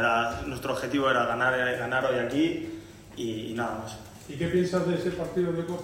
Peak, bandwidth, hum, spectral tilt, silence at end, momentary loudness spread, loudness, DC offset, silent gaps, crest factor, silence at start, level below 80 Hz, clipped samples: -12 dBFS; 16 kHz; none; -5.5 dB/octave; 0 s; 14 LU; -28 LUFS; under 0.1%; none; 16 dB; 0 s; -54 dBFS; under 0.1%